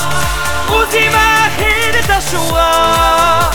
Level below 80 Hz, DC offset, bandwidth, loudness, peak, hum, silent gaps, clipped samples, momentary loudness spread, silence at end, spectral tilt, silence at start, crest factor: -24 dBFS; under 0.1%; over 20 kHz; -11 LUFS; 0 dBFS; none; none; under 0.1%; 6 LU; 0 s; -3 dB/octave; 0 s; 12 dB